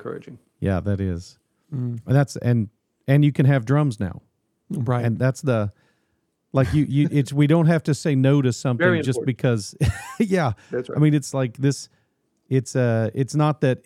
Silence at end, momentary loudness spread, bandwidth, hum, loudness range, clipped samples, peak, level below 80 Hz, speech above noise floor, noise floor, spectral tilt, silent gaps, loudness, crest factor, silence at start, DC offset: 0.1 s; 12 LU; 12 kHz; none; 4 LU; under 0.1%; -4 dBFS; -46 dBFS; 51 dB; -71 dBFS; -7 dB/octave; none; -22 LUFS; 16 dB; 0 s; under 0.1%